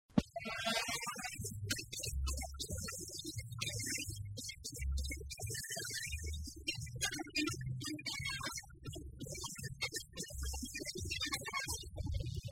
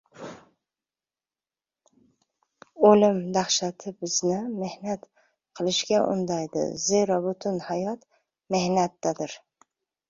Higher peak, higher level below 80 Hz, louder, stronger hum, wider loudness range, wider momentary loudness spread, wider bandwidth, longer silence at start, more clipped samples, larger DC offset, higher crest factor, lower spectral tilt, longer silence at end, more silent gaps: second, -16 dBFS vs -4 dBFS; first, -48 dBFS vs -68 dBFS; second, -41 LUFS vs -25 LUFS; neither; about the same, 2 LU vs 3 LU; second, 7 LU vs 15 LU; first, 16 kHz vs 7.8 kHz; about the same, 0.1 s vs 0.15 s; neither; neither; about the same, 26 dB vs 24 dB; about the same, -3 dB/octave vs -4 dB/octave; second, 0 s vs 0.7 s; neither